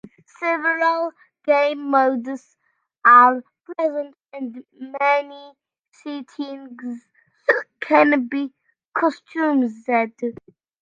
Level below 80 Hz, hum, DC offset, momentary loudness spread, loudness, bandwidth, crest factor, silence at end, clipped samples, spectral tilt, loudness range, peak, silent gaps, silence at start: -76 dBFS; none; under 0.1%; 18 LU; -19 LUFS; 7.6 kHz; 20 dB; 0.5 s; under 0.1%; -5 dB/octave; 8 LU; 0 dBFS; 5.88-5.92 s, 8.88-8.92 s; 0.05 s